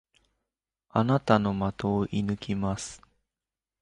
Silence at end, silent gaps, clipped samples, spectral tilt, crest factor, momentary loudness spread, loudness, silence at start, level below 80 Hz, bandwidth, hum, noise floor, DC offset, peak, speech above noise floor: 0.85 s; none; under 0.1%; -6.5 dB/octave; 24 dB; 8 LU; -28 LUFS; 0.95 s; -52 dBFS; 11 kHz; none; under -90 dBFS; under 0.1%; -6 dBFS; over 63 dB